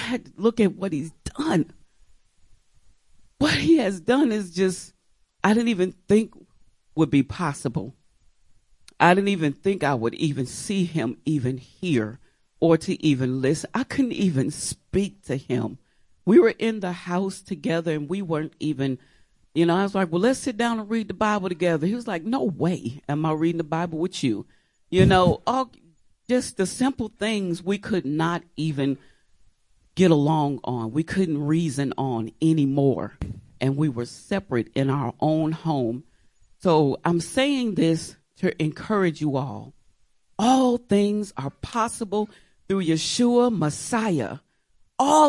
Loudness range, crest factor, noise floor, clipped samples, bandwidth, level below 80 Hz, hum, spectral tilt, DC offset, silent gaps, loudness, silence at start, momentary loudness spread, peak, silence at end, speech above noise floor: 3 LU; 20 dB; -63 dBFS; under 0.1%; 11.5 kHz; -52 dBFS; none; -6 dB/octave; under 0.1%; none; -24 LUFS; 0 s; 10 LU; -4 dBFS; 0 s; 41 dB